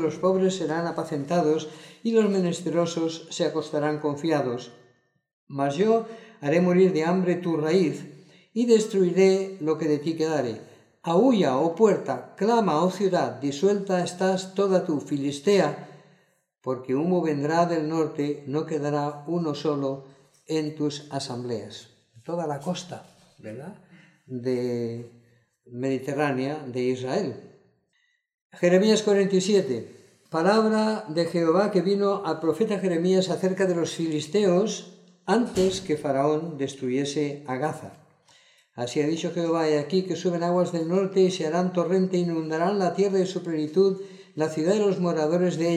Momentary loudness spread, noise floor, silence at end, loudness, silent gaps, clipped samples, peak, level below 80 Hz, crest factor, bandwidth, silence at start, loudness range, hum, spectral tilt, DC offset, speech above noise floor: 12 LU; -71 dBFS; 0 s; -25 LUFS; 5.33-5.47 s, 28.34-28.50 s; under 0.1%; -6 dBFS; -68 dBFS; 18 dB; 12 kHz; 0 s; 7 LU; none; -6 dB/octave; under 0.1%; 47 dB